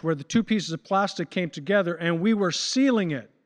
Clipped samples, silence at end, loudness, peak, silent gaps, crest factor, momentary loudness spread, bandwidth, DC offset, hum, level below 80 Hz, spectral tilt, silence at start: under 0.1%; 0.2 s; -25 LUFS; -10 dBFS; none; 14 dB; 7 LU; 10 kHz; under 0.1%; none; -66 dBFS; -5 dB/octave; 0.05 s